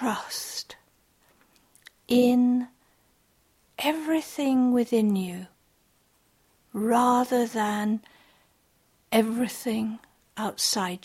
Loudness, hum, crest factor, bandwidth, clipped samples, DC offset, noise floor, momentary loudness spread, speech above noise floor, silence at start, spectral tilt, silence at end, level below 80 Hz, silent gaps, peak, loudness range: -25 LUFS; none; 18 dB; 16 kHz; under 0.1%; under 0.1%; -66 dBFS; 15 LU; 41 dB; 0 s; -4 dB/octave; 0.1 s; -68 dBFS; none; -10 dBFS; 3 LU